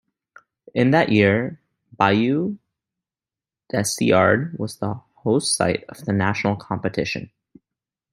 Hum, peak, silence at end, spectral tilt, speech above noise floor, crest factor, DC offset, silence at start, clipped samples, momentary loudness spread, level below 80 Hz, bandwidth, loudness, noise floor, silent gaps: none; -2 dBFS; 0.85 s; -5 dB/octave; over 70 dB; 20 dB; under 0.1%; 0.75 s; under 0.1%; 12 LU; -58 dBFS; 16 kHz; -21 LUFS; under -90 dBFS; none